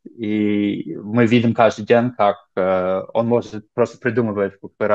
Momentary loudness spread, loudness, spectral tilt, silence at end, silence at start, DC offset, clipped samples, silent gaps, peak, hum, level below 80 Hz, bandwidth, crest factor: 9 LU; -19 LUFS; -7.5 dB/octave; 0 s; 0.15 s; under 0.1%; under 0.1%; none; 0 dBFS; none; -64 dBFS; 7.8 kHz; 18 dB